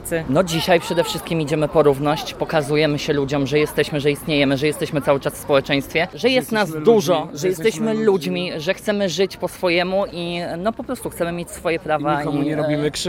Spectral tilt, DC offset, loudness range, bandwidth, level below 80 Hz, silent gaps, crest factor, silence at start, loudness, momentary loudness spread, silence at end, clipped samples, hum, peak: -5 dB/octave; under 0.1%; 3 LU; 17 kHz; -46 dBFS; none; 18 dB; 0 s; -20 LUFS; 7 LU; 0 s; under 0.1%; none; -2 dBFS